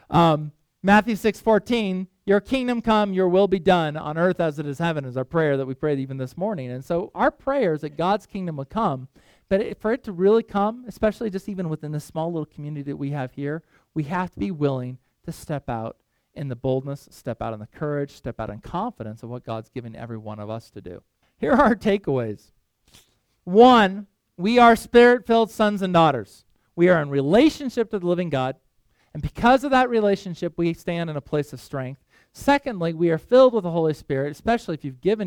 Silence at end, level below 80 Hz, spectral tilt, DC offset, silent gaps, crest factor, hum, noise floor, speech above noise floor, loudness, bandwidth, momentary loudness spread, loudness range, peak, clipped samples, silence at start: 0 s; -50 dBFS; -7 dB/octave; under 0.1%; none; 20 dB; none; -64 dBFS; 42 dB; -22 LUFS; 17.5 kHz; 16 LU; 12 LU; -2 dBFS; under 0.1%; 0.1 s